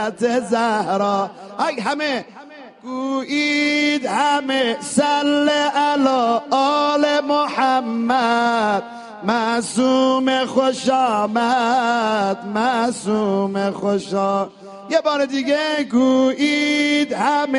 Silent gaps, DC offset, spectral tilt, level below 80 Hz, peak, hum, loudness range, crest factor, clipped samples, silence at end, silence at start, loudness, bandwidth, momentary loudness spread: none; under 0.1%; -4 dB/octave; -66 dBFS; -4 dBFS; none; 3 LU; 14 dB; under 0.1%; 0 s; 0 s; -18 LUFS; 11 kHz; 6 LU